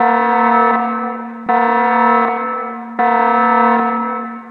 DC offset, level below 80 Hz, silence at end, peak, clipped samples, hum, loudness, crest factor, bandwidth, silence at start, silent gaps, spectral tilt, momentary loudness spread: under 0.1%; -70 dBFS; 0 s; -2 dBFS; under 0.1%; none; -14 LUFS; 14 dB; 5.2 kHz; 0 s; none; -7.5 dB/octave; 11 LU